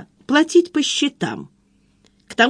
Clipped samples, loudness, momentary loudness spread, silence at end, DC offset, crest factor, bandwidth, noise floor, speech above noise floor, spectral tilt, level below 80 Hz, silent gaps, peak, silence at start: under 0.1%; -18 LUFS; 14 LU; 0 s; under 0.1%; 18 dB; 10.5 kHz; -59 dBFS; 41 dB; -3 dB/octave; -64 dBFS; none; -2 dBFS; 0 s